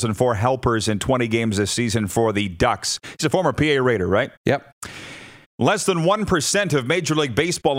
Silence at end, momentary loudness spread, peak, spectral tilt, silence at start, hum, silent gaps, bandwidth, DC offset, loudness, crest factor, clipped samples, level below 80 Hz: 0 s; 6 LU; -2 dBFS; -4.5 dB/octave; 0 s; none; 4.37-4.45 s, 4.72-4.82 s, 5.46-5.58 s; 16 kHz; under 0.1%; -20 LUFS; 18 dB; under 0.1%; -46 dBFS